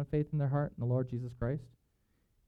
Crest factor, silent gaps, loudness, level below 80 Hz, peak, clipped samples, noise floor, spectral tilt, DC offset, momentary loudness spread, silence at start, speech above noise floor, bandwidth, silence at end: 16 dB; none; -35 LUFS; -54 dBFS; -20 dBFS; under 0.1%; -75 dBFS; -11 dB/octave; under 0.1%; 6 LU; 0 s; 41 dB; 4.5 kHz; 0.8 s